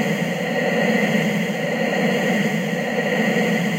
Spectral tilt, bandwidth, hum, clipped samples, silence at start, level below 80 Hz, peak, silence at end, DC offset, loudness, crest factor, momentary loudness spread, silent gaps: -5.5 dB/octave; 16 kHz; none; under 0.1%; 0 s; -68 dBFS; -6 dBFS; 0 s; under 0.1%; -20 LUFS; 14 dB; 4 LU; none